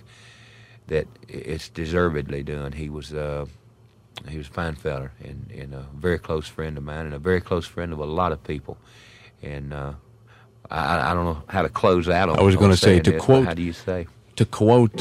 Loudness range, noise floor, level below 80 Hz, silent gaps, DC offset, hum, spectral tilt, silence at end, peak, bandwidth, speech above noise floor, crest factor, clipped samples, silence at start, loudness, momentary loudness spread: 12 LU; -53 dBFS; -42 dBFS; none; under 0.1%; none; -6.5 dB/octave; 0 s; -2 dBFS; 14 kHz; 31 dB; 22 dB; under 0.1%; 0.85 s; -23 LUFS; 20 LU